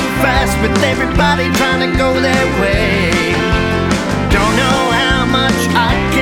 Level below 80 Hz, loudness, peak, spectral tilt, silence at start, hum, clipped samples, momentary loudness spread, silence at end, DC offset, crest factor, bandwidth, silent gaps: -24 dBFS; -13 LUFS; -2 dBFS; -5 dB/octave; 0 s; none; under 0.1%; 2 LU; 0 s; under 0.1%; 10 dB; 17.5 kHz; none